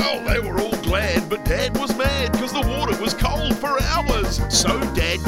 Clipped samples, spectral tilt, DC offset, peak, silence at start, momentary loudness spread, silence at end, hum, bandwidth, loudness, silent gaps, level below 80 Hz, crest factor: under 0.1%; -4 dB/octave; under 0.1%; -4 dBFS; 0 s; 4 LU; 0 s; none; 16.5 kHz; -21 LUFS; none; -28 dBFS; 16 dB